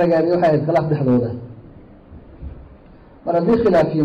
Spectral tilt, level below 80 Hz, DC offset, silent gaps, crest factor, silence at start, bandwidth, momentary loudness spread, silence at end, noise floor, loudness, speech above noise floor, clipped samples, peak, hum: -9.5 dB/octave; -44 dBFS; under 0.1%; none; 10 dB; 0 s; 7.8 kHz; 22 LU; 0 s; -44 dBFS; -17 LUFS; 28 dB; under 0.1%; -8 dBFS; none